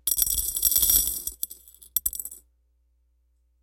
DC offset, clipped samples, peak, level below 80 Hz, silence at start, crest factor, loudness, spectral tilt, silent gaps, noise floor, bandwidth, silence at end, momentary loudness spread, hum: under 0.1%; under 0.1%; -4 dBFS; -46 dBFS; 0.05 s; 24 dB; -22 LUFS; 0.5 dB/octave; none; -67 dBFS; 17.5 kHz; 1.25 s; 16 LU; none